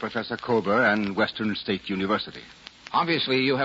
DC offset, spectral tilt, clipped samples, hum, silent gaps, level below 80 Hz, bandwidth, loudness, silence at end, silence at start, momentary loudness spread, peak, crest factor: under 0.1%; -6 dB/octave; under 0.1%; none; none; -62 dBFS; 7.8 kHz; -25 LUFS; 0 s; 0 s; 14 LU; -10 dBFS; 16 dB